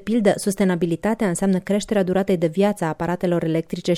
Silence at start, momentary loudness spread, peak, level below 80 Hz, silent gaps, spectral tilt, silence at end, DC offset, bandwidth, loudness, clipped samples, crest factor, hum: 0 s; 4 LU; -4 dBFS; -50 dBFS; none; -6 dB/octave; 0 s; under 0.1%; 15 kHz; -21 LUFS; under 0.1%; 16 dB; none